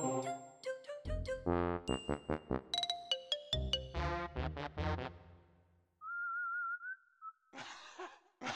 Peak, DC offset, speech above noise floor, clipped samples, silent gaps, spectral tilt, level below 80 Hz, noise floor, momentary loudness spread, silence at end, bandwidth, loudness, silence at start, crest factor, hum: -20 dBFS; under 0.1%; 33 dB; under 0.1%; none; -4.5 dB/octave; -52 dBFS; -71 dBFS; 14 LU; 0 s; 13.5 kHz; -40 LUFS; 0 s; 22 dB; none